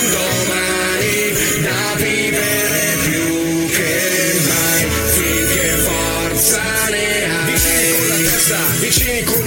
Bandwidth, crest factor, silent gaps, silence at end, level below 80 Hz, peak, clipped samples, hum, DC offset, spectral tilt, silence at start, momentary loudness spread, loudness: over 20 kHz; 16 dB; none; 0 s; -32 dBFS; 0 dBFS; under 0.1%; none; under 0.1%; -2.5 dB/octave; 0 s; 4 LU; -14 LUFS